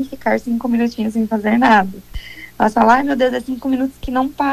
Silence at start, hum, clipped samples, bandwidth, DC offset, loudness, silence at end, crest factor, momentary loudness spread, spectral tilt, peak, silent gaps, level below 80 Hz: 0 s; none; under 0.1%; 14 kHz; under 0.1%; -16 LUFS; 0 s; 14 dB; 13 LU; -6 dB/octave; -2 dBFS; none; -40 dBFS